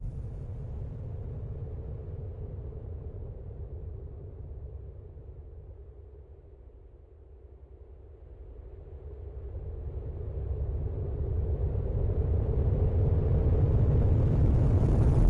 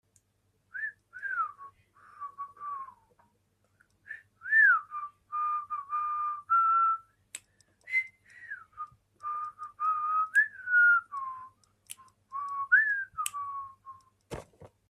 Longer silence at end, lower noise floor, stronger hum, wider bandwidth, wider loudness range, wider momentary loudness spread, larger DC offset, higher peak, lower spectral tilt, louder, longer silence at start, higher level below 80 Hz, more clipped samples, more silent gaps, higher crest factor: second, 0 s vs 0.25 s; second, -51 dBFS vs -74 dBFS; neither; second, 3.5 kHz vs 14.5 kHz; first, 23 LU vs 12 LU; about the same, 24 LU vs 23 LU; neither; about the same, -14 dBFS vs -12 dBFS; first, -11 dB/octave vs -1 dB/octave; second, -31 LUFS vs -28 LUFS; second, 0 s vs 0.75 s; first, -34 dBFS vs -72 dBFS; neither; neither; about the same, 16 dB vs 20 dB